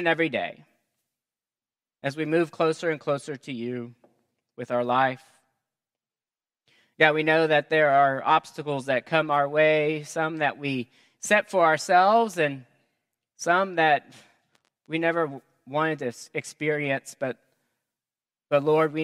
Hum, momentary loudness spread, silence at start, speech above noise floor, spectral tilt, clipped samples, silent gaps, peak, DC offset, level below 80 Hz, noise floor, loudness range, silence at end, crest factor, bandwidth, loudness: none; 14 LU; 0 s; over 66 dB; -5 dB/octave; under 0.1%; none; -2 dBFS; under 0.1%; -80 dBFS; under -90 dBFS; 7 LU; 0 s; 24 dB; 14 kHz; -24 LUFS